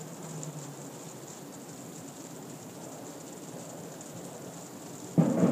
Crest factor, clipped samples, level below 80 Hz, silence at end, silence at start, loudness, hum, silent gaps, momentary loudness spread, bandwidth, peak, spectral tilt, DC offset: 24 dB; under 0.1%; -74 dBFS; 0 s; 0 s; -37 LUFS; none; none; 14 LU; 15.5 kHz; -12 dBFS; -6 dB/octave; under 0.1%